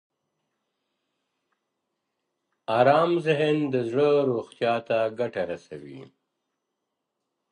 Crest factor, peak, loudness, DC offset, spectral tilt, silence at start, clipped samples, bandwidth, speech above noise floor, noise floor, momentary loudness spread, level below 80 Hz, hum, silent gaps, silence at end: 22 dB; -6 dBFS; -24 LUFS; under 0.1%; -7 dB/octave; 2.7 s; under 0.1%; 10 kHz; 58 dB; -82 dBFS; 19 LU; -72 dBFS; none; none; 1.45 s